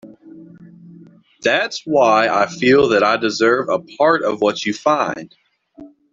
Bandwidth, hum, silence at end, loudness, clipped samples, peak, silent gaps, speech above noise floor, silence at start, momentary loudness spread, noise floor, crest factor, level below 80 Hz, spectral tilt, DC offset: 7.8 kHz; none; 0.25 s; -16 LUFS; under 0.1%; -2 dBFS; none; 29 dB; 0.05 s; 6 LU; -45 dBFS; 16 dB; -58 dBFS; -4.5 dB/octave; under 0.1%